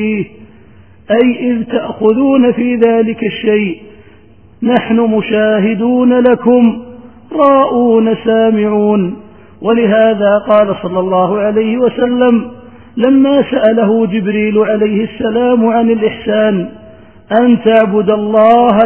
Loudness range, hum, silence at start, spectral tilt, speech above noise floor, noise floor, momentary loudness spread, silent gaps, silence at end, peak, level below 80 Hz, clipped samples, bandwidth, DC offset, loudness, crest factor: 2 LU; none; 0 s; -10.5 dB/octave; 32 dB; -42 dBFS; 7 LU; none; 0 s; 0 dBFS; -48 dBFS; 0.1%; 3.7 kHz; 0.5%; -11 LUFS; 10 dB